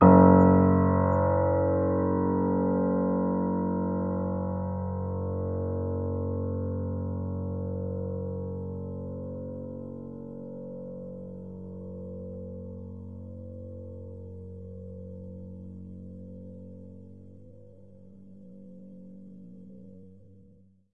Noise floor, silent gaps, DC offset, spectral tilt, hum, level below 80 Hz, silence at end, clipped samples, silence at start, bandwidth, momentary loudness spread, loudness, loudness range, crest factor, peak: -59 dBFS; none; 0.2%; -13.5 dB/octave; none; -60 dBFS; 0.8 s; under 0.1%; 0 s; 2.7 kHz; 22 LU; -27 LUFS; 22 LU; 24 dB; -4 dBFS